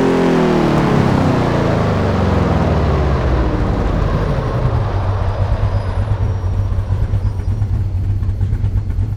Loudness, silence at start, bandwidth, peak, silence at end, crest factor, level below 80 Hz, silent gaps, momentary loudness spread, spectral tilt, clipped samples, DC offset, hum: -17 LUFS; 0 s; 9.4 kHz; -2 dBFS; 0 s; 14 dB; -22 dBFS; none; 6 LU; -8 dB/octave; under 0.1%; under 0.1%; none